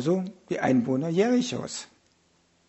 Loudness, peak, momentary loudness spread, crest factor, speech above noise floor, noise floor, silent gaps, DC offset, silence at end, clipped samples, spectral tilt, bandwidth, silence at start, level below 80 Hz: -26 LUFS; -10 dBFS; 11 LU; 18 dB; 40 dB; -66 dBFS; none; under 0.1%; 0.85 s; under 0.1%; -6 dB/octave; 8.2 kHz; 0 s; -66 dBFS